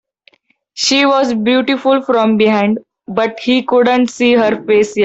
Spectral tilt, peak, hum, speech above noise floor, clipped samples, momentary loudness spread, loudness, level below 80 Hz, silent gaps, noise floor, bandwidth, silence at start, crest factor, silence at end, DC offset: -4 dB/octave; -2 dBFS; none; 40 dB; under 0.1%; 6 LU; -13 LUFS; -56 dBFS; none; -53 dBFS; 8.2 kHz; 0.75 s; 12 dB; 0 s; under 0.1%